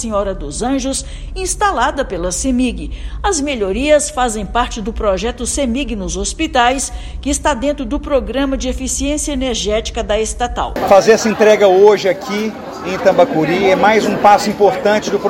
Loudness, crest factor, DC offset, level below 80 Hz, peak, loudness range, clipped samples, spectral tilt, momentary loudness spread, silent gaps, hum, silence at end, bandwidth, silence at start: -15 LUFS; 14 dB; under 0.1%; -28 dBFS; 0 dBFS; 6 LU; 0.2%; -3.5 dB/octave; 10 LU; none; none; 0 s; 16.5 kHz; 0 s